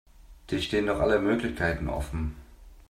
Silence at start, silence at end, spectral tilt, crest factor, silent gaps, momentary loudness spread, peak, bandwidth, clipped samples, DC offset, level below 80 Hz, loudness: 0.2 s; 0.1 s; -6 dB/octave; 18 dB; none; 10 LU; -10 dBFS; 15 kHz; under 0.1%; under 0.1%; -40 dBFS; -28 LUFS